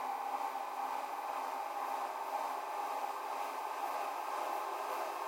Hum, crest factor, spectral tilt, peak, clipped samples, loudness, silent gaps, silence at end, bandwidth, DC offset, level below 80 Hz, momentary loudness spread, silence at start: none; 14 dB; -0.5 dB/octave; -26 dBFS; under 0.1%; -39 LUFS; none; 0 s; 16.5 kHz; under 0.1%; under -90 dBFS; 1 LU; 0 s